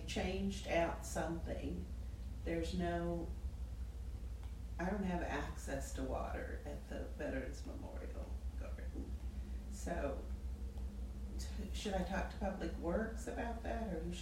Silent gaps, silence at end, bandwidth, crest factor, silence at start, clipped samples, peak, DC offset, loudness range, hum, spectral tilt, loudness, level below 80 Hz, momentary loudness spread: none; 0 s; 15.5 kHz; 18 dB; 0 s; under 0.1%; -24 dBFS; under 0.1%; 5 LU; none; -6 dB/octave; -43 LUFS; -46 dBFS; 9 LU